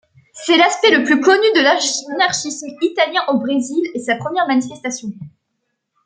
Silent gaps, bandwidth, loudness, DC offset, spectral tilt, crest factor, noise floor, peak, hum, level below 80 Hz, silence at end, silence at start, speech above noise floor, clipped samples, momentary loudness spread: none; 9.6 kHz; -16 LUFS; under 0.1%; -2.5 dB/octave; 16 dB; -73 dBFS; -2 dBFS; none; -66 dBFS; 0.75 s; 0.35 s; 57 dB; under 0.1%; 13 LU